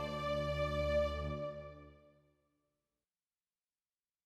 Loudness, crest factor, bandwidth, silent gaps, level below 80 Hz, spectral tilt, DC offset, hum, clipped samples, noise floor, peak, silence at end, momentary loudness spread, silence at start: -38 LUFS; 16 dB; 13 kHz; none; -50 dBFS; -6.5 dB/octave; under 0.1%; none; under 0.1%; under -90 dBFS; -24 dBFS; 2.3 s; 17 LU; 0 s